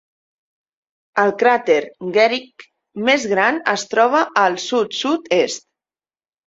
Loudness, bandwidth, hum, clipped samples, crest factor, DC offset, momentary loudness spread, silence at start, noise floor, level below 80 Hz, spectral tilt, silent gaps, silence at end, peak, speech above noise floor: -17 LUFS; 8 kHz; none; under 0.1%; 18 dB; under 0.1%; 7 LU; 1.15 s; under -90 dBFS; -66 dBFS; -3 dB/octave; none; 0.9 s; 0 dBFS; over 73 dB